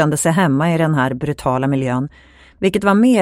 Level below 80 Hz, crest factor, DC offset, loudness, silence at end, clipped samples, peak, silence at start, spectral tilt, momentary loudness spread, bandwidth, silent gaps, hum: -46 dBFS; 16 dB; under 0.1%; -17 LUFS; 0 s; under 0.1%; 0 dBFS; 0 s; -6 dB/octave; 7 LU; 16 kHz; none; none